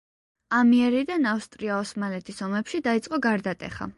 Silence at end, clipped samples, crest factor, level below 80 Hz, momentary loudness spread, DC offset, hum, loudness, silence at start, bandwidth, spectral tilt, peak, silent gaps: 0.05 s; under 0.1%; 14 dB; -60 dBFS; 12 LU; under 0.1%; none; -25 LUFS; 0.5 s; 11.5 kHz; -5.5 dB/octave; -10 dBFS; none